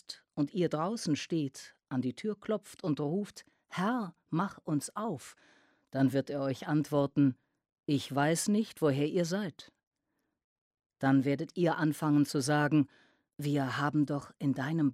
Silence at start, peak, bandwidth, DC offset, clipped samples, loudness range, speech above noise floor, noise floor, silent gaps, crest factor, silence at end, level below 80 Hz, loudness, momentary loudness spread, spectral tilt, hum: 0.1 s; -16 dBFS; 15 kHz; under 0.1%; under 0.1%; 5 LU; 52 dB; -83 dBFS; 7.72-7.76 s, 9.87-9.91 s, 10.44-10.71 s, 10.86-10.90 s; 16 dB; 0 s; -74 dBFS; -32 LUFS; 10 LU; -6 dB/octave; none